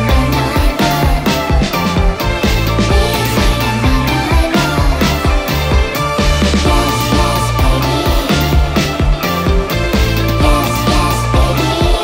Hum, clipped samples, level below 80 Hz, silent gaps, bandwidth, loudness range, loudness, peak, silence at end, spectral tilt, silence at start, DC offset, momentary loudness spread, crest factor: none; under 0.1%; -16 dBFS; none; 16.5 kHz; 1 LU; -13 LUFS; 0 dBFS; 0 s; -5 dB/octave; 0 s; under 0.1%; 2 LU; 12 dB